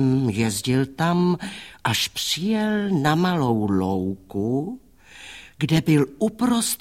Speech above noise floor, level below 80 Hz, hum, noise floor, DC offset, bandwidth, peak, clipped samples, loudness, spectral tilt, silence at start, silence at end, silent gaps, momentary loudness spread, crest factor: 23 dB; -54 dBFS; none; -44 dBFS; 0.1%; 16.5 kHz; -6 dBFS; under 0.1%; -22 LUFS; -5 dB/octave; 0 s; 0.05 s; none; 12 LU; 18 dB